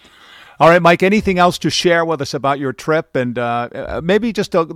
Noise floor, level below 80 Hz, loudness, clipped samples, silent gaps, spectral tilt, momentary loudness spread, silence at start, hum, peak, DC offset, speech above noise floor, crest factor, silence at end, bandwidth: -43 dBFS; -44 dBFS; -15 LUFS; under 0.1%; none; -5 dB/octave; 10 LU; 0.6 s; none; -2 dBFS; under 0.1%; 28 dB; 14 dB; 0 s; 15.5 kHz